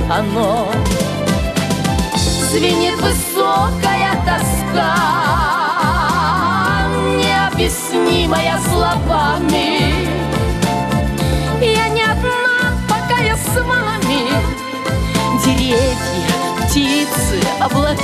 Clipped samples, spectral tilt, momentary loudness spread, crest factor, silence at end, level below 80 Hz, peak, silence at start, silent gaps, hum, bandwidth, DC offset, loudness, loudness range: under 0.1%; -4.5 dB/octave; 3 LU; 14 dB; 0 s; -26 dBFS; -2 dBFS; 0 s; none; none; 15 kHz; under 0.1%; -15 LUFS; 1 LU